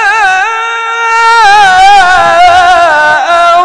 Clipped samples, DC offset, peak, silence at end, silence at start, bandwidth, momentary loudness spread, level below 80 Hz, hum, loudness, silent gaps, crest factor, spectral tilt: 10%; under 0.1%; 0 dBFS; 0 s; 0 s; 12 kHz; 7 LU; -36 dBFS; none; -4 LUFS; none; 4 dB; -1 dB/octave